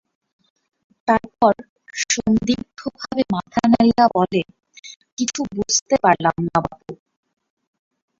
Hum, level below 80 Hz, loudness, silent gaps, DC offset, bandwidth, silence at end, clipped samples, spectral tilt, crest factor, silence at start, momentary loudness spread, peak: none; -50 dBFS; -19 LUFS; 1.69-1.76 s, 4.96-5.00 s, 5.12-5.17 s, 5.82-5.86 s; under 0.1%; 7.6 kHz; 1.25 s; under 0.1%; -4 dB/octave; 20 dB; 1.05 s; 18 LU; -2 dBFS